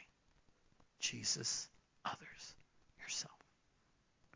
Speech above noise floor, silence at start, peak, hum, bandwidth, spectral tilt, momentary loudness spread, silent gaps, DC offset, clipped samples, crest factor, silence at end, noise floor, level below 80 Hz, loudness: 32 dB; 0 s; -26 dBFS; none; 8 kHz; -0.5 dB/octave; 17 LU; none; under 0.1%; under 0.1%; 22 dB; 1 s; -76 dBFS; -78 dBFS; -42 LUFS